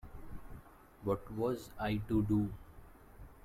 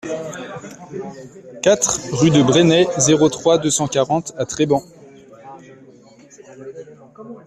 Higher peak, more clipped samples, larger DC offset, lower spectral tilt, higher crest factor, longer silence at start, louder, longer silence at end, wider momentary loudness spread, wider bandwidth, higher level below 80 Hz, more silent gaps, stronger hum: second, -22 dBFS vs -2 dBFS; neither; neither; first, -8 dB/octave vs -4.5 dB/octave; about the same, 16 dB vs 18 dB; about the same, 0.05 s vs 0.05 s; second, -36 LUFS vs -16 LUFS; about the same, 0.05 s vs 0.05 s; about the same, 23 LU vs 23 LU; first, 15.5 kHz vs 14 kHz; about the same, -52 dBFS vs -54 dBFS; neither; neither